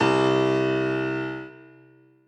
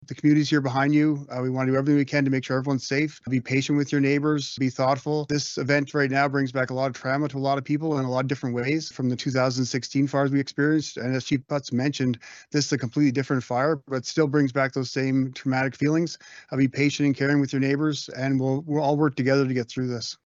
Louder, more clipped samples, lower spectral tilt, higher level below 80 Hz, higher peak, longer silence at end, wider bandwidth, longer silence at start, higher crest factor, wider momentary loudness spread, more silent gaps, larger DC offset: about the same, -24 LUFS vs -24 LUFS; neither; about the same, -6.5 dB/octave vs -6 dB/octave; first, -58 dBFS vs -66 dBFS; about the same, -8 dBFS vs -8 dBFS; first, 0.65 s vs 0.15 s; first, 8.8 kHz vs 7.8 kHz; about the same, 0 s vs 0.1 s; about the same, 16 dB vs 16 dB; first, 15 LU vs 6 LU; neither; neither